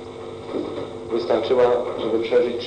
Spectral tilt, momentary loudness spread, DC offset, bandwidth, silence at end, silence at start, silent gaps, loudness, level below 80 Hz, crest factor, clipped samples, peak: -6 dB/octave; 13 LU; under 0.1%; 9.2 kHz; 0 s; 0 s; none; -22 LUFS; -56 dBFS; 14 dB; under 0.1%; -8 dBFS